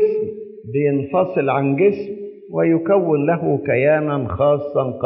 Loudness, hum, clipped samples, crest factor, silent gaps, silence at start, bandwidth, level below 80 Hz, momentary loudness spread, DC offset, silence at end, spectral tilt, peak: -18 LUFS; none; under 0.1%; 14 dB; none; 0 s; 5.6 kHz; -52 dBFS; 11 LU; under 0.1%; 0 s; -7.5 dB/octave; -4 dBFS